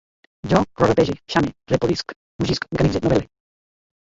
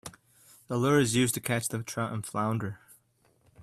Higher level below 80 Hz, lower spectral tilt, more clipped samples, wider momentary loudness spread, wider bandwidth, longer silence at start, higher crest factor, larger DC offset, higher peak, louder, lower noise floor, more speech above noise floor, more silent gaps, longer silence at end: first, -40 dBFS vs -62 dBFS; first, -6.5 dB/octave vs -4.5 dB/octave; neither; second, 9 LU vs 14 LU; second, 7.8 kHz vs 15.5 kHz; first, 0.45 s vs 0.05 s; about the same, 20 dB vs 18 dB; neither; first, -2 dBFS vs -12 dBFS; first, -21 LUFS vs -29 LUFS; first, under -90 dBFS vs -68 dBFS; first, over 70 dB vs 39 dB; first, 2.16-2.39 s vs none; first, 0.8 s vs 0 s